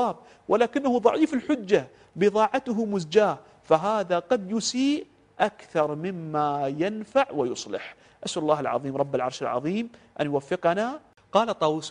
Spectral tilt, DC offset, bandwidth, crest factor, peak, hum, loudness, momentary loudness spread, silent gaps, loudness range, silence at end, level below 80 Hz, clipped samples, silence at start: -5 dB/octave; under 0.1%; 10.5 kHz; 20 dB; -4 dBFS; none; -26 LUFS; 10 LU; none; 4 LU; 0 s; -66 dBFS; under 0.1%; 0 s